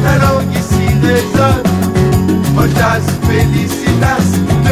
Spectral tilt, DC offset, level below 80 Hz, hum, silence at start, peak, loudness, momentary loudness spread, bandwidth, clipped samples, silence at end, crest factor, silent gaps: -6 dB/octave; under 0.1%; -26 dBFS; none; 0 s; 0 dBFS; -12 LUFS; 3 LU; 16 kHz; under 0.1%; 0 s; 10 dB; none